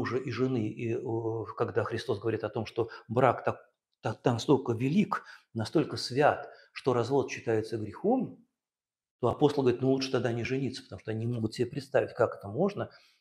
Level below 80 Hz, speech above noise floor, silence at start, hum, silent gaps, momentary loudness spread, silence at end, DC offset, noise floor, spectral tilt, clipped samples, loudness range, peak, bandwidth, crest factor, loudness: -68 dBFS; over 60 dB; 0 s; none; 9.11-9.19 s; 10 LU; 0.35 s; under 0.1%; under -90 dBFS; -6.5 dB/octave; under 0.1%; 2 LU; -8 dBFS; 12.5 kHz; 22 dB; -31 LUFS